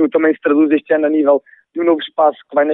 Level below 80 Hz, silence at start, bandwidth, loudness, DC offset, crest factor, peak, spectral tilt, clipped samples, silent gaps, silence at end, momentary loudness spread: -68 dBFS; 0 s; 3.9 kHz; -15 LUFS; under 0.1%; 14 dB; -2 dBFS; -9.5 dB/octave; under 0.1%; none; 0 s; 4 LU